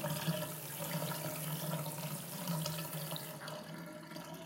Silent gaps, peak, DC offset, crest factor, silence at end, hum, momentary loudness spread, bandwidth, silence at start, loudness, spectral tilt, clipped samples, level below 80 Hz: none; -20 dBFS; under 0.1%; 20 dB; 0 s; none; 9 LU; 17 kHz; 0 s; -41 LUFS; -4 dB/octave; under 0.1%; -78 dBFS